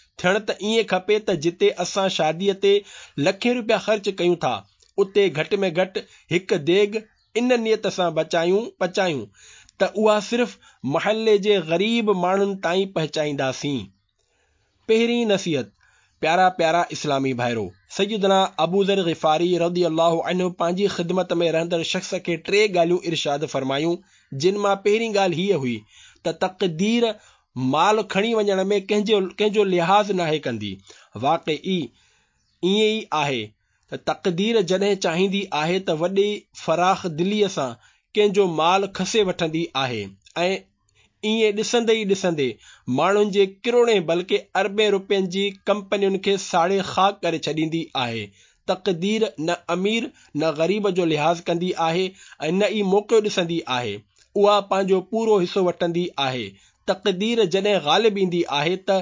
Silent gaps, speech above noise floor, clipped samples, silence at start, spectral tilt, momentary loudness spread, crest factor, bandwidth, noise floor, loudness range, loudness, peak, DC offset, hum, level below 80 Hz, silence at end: none; 46 dB; under 0.1%; 0.2 s; -5 dB/octave; 9 LU; 16 dB; 7.6 kHz; -67 dBFS; 3 LU; -22 LUFS; -4 dBFS; under 0.1%; none; -64 dBFS; 0 s